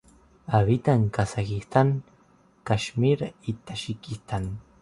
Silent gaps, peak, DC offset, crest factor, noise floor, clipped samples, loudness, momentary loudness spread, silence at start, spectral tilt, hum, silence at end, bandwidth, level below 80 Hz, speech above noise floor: none; -6 dBFS; under 0.1%; 20 dB; -59 dBFS; under 0.1%; -26 LUFS; 13 LU; 0.5 s; -7 dB/octave; none; 0.2 s; 11.5 kHz; -48 dBFS; 35 dB